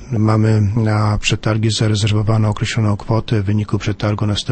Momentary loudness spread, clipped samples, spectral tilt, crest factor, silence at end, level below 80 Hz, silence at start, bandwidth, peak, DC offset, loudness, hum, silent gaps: 4 LU; under 0.1%; -6 dB/octave; 14 dB; 0 s; -34 dBFS; 0 s; 8.8 kHz; -2 dBFS; under 0.1%; -17 LUFS; none; none